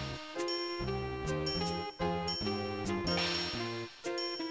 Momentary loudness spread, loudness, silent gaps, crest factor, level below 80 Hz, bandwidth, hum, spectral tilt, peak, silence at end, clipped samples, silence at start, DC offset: 6 LU; -35 LUFS; none; 16 dB; -52 dBFS; 8 kHz; none; -4.5 dB/octave; -20 dBFS; 0 s; under 0.1%; 0 s; under 0.1%